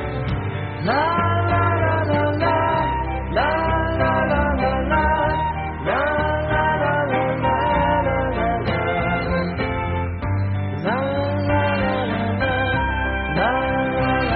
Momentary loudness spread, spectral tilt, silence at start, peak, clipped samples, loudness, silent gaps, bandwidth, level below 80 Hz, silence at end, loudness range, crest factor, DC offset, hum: 5 LU; -5 dB/octave; 0 s; -6 dBFS; under 0.1%; -20 LUFS; none; 5 kHz; -32 dBFS; 0 s; 2 LU; 14 dB; under 0.1%; none